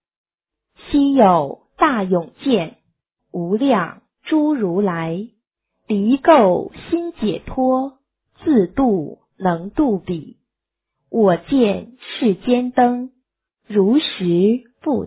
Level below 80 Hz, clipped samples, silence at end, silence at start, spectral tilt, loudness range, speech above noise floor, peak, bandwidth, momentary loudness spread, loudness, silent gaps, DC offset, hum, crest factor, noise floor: -48 dBFS; under 0.1%; 0 s; 0.85 s; -11 dB/octave; 3 LU; 66 dB; 0 dBFS; 4 kHz; 14 LU; -18 LUFS; none; under 0.1%; none; 18 dB; -82 dBFS